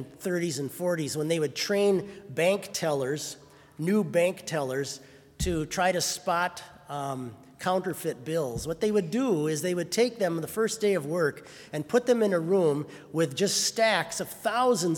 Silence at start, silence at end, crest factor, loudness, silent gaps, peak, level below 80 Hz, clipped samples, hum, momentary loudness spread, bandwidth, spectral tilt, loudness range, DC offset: 0 s; 0 s; 18 dB; -28 LUFS; none; -10 dBFS; -54 dBFS; under 0.1%; none; 10 LU; 18 kHz; -4 dB/octave; 4 LU; under 0.1%